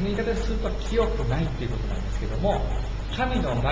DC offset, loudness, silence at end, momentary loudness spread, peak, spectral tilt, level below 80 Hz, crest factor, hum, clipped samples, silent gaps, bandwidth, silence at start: under 0.1%; -27 LUFS; 0 s; 5 LU; -10 dBFS; -6.5 dB/octave; -28 dBFS; 14 dB; none; under 0.1%; none; 7.8 kHz; 0 s